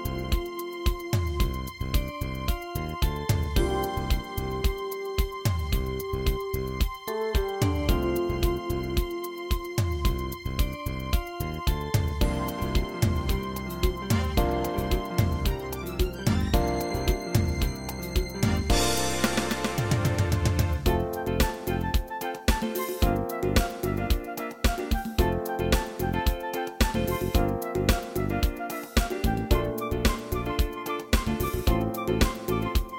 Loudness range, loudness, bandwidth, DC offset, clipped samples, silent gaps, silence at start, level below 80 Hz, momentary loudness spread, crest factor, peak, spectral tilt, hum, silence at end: 3 LU; -28 LUFS; 17 kHz; under 0.1%; under 0.1%; none; 0 s; -30 dBFS; 5 LU; 18 dB; -8 dBFS; -5.5 dB/octave; none; 0 s